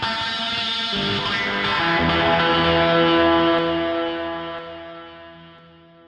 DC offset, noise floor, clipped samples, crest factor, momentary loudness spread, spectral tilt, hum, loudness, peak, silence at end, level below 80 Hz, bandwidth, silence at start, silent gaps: under 0.1%; -48 dBFS; under 0.1%; 16 dB; 17 LU; -5.5 dB/octave; none; -19 LUFS; -6 dBFS; 0.55 s; -46 dBFS; 9.2 kHz; 0 s; none